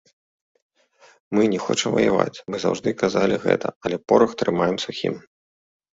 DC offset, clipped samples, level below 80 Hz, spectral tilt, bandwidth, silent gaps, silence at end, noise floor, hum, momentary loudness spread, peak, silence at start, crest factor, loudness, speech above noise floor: under 0.1%; under 0.1%; -58 dBFS; -5 dB/octave; 8 kHz; 3.76-3.81 s; 0.75 s; -55 dBFS; none; 8 LU; -2 dBFS; 1.3 s; 22 dB; -22 LUFS; 34 dB